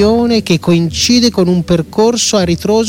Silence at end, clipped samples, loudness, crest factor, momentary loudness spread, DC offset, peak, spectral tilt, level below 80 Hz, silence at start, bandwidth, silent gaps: 0 s; under 0.1%; -11 LUFS; 10 dB; 3 LU; under 0.1%; 0 dBFS; -4.5 dB/octave; -34 dBFS; 0 s; 16.5 kHz; none